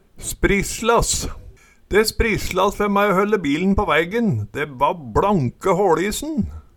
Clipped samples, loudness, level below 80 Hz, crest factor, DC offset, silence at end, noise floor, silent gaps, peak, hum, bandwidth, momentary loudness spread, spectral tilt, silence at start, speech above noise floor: under 0.1%; -19 LUFS; -34 dBFS; 16 dB; under 0.1%; 0.15 s; -44 dBFS; none; -4 dBFS; none; 18.5 kHz; 7 LU; -4.5 dB/octave; 0.15 s; 25 dB